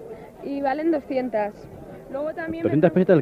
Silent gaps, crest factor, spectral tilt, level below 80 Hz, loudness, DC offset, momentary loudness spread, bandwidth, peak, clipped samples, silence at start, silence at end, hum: none; 20 dB; -9.5 dB/octave; -56 dBFS; -24 LUFS; under 0.1%; 21 LU; 6.4 kHz; -4 dBFS; under 0.1%; 0 s; 0 s; none